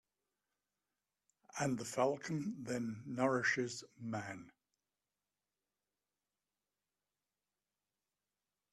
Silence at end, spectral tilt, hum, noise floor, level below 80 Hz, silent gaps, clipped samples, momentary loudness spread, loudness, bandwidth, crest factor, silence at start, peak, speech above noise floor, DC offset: 4.2 s; -5 dB/octave; 50 Hz at -75 dBFS; under -90 dBFS; -80 dBFS; none; under 0.1%; 12 LU; -39 LUFS; 13 kHz; 22 dB; 1.55 s; -22 dBFS; over 51 dB; under 0.1%